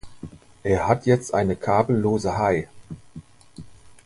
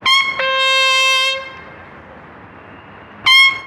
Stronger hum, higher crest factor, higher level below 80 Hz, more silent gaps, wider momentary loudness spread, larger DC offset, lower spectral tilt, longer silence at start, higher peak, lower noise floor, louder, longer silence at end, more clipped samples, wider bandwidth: neither; first, 20 dB vs 14 dB; first, -46 dBFS vs -56 dBFS; neither; first, 22 LU vs 11 LU; neither; first, -7 dB/octave vs 0.5 dB/octave; about the same, 0.05 s vs 0 s; about the same, -4 dBFS vs -2 dBFS; first, -44 dBFS vs -38 dBFS; second, -22 LUFS vs -12 LUFS; first, 0.15 s vs 0 s; neither; second, 11.5 kHz vs 16 kHz